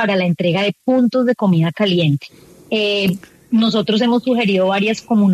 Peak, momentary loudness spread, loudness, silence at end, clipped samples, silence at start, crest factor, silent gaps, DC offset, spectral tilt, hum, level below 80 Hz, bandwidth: -4 dBFS; 4 LU; -16 LUFS; 0 s; under 0.1%; 0 s; 12 dB; none; under 0.1%; -6.5 dB/octave; none; -60 dBFS; 13.5 kHz